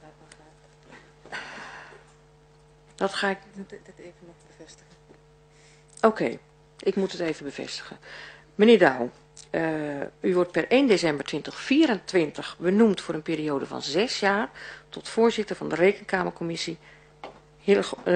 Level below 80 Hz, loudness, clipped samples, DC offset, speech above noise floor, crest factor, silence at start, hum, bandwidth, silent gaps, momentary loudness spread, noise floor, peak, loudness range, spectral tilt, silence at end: -62 dBFS; -25 LUFS; under 0.1%; under 0.1%; 31 dB; 22 dB; 0.05 s; none; 10 kHz; none; 21 LU; -56 dBFS; -4 dBFS; 11 LU; -5 dB/octave; 0 s